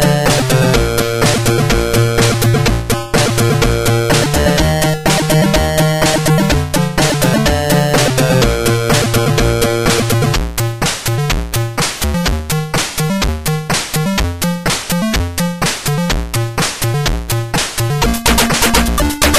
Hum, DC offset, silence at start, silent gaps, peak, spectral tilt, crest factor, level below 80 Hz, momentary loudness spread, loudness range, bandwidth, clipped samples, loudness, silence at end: none; under 0.1%; 0 s; none; 0 dBFS; -4.5 dB/octave; 14 dB; -24 dBFS; 5 LU; 4 LU; 16 kHz; under 0.1%; -13 LUFS; 0 s